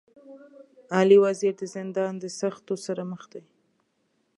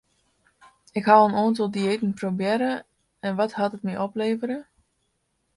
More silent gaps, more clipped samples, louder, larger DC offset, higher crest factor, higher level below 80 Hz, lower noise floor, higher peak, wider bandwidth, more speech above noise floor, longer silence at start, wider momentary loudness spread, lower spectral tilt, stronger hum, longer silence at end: neither; neither; about the same, -25 LUFS vs -24 LUFS; neither; about the same, 20 dB vs 22 dB; second, -82 dBFS vs -68 dBFS; about the same, -72 dBFS vs -73 dBFS; second, -6 dBFS vs -2 dBFS; about the same, 11 kHz vs 11.5 kHz; about the same, 48 dB vs 50 dB; second, 0.3 s vs 0.95 s; about the same, 17 LU vs 15 LU; about the same, -5.5 dB/octave vs -6.5 dB/octave; neither; about the same, 1 s vs 0.95 s